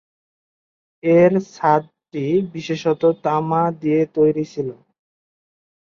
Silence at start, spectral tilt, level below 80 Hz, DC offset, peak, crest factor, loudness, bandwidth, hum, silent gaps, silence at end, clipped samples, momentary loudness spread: 1.05 s; -8 dB/octave; -62 dBFS; under 0.1%; -2 dBFS; 18 dB; -19 LUFS; 7.2 kHz; none; none; 1.2 s; under 0.1%; 12 LU